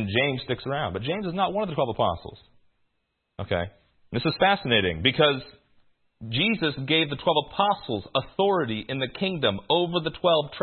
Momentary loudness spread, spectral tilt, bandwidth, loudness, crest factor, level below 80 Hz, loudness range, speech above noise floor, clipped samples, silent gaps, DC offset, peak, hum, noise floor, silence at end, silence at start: 8 LU; -10 dB/octave; 4.5 kHz; -25 LUFS; 20 dB; -56 dBFS; 5 LU; 51 dB; under 0.1%; none; under 0.1%; -6 dBFS; none; -77 dBFS; 0 s; 0 s